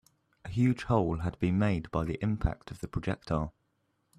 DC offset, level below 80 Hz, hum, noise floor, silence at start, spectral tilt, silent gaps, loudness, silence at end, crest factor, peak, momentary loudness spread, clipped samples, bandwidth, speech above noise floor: under 0.1%; -46 dBFS; none; -76 dBFS; 0.45 s; -8 dB/octave; none; -31 LUFS; 0.7 s; 18 dB; -12 dBFS; 10 LU; under 0.1%; 11 kHz; 46 dB